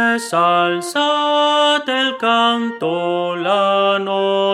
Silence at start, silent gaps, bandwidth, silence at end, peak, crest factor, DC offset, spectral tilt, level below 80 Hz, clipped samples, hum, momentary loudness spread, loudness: 0 s; none; 14.5 kHz; 0 s; -4 dBFS; 14 dB; under 0.1%; -3.5 dB/octave; -74 dBFS; under 0.1%; none; 5 LU; -16 LUFS